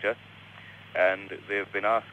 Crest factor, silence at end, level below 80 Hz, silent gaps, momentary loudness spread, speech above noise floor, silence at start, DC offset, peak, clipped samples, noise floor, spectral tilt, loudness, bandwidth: 18 dB; 0 s; -72 dBFS; none; 21 LU; 18 dB; 0 s; under 0.1%; -12 dBFS; under 0.1%; -48 dBFS; -5.5 dB/octave; -29 LUFS; 9 kHz